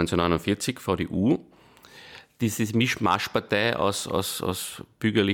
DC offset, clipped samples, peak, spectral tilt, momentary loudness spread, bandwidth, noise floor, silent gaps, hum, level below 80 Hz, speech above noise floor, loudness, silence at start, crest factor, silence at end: under 0.1%; under 0.1%; -8 dBFS; -4.5 dB/octave; 8 LU; 19 kHz; -51 dBFS; none; none; -52 dBFS; 25 dB; -26 LUFS; 0 s; 18 dB; 0 s